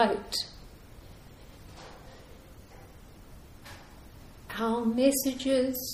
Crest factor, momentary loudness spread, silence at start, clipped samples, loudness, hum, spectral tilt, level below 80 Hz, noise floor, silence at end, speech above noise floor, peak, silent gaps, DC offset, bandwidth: 22 dB; 26 LU; 0 s; under 0.1%; -29 LUFS; none; -3.5 dB/octave; -54 dBFS; -50 dBFS; 0 s; 23 dB; -10 dBFS; none; under 0.1%; 15.5 kHz